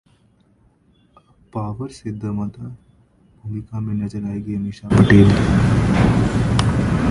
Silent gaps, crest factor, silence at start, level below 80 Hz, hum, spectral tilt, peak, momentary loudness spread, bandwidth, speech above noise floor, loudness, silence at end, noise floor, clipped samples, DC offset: none; 18 dB; 1.55 s; -32 dBFS; none; -7.5 dB/octave; 0 dBFS; 19 LU; 11.5 kHz; 39 dB; -18 LUFS; 0 s; -57 dBFS; under 0.1%; under 0.1%